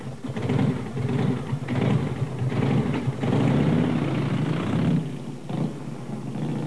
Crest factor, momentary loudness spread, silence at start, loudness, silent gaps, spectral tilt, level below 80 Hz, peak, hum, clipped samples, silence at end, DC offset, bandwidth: 14 dB; 11 LU; 0 s; -25 LUFS; none; -8 dB/octave; -50 dBFS; -10 dBFS; none; under 0.1%; 0 s; 0.8%; 11 kHz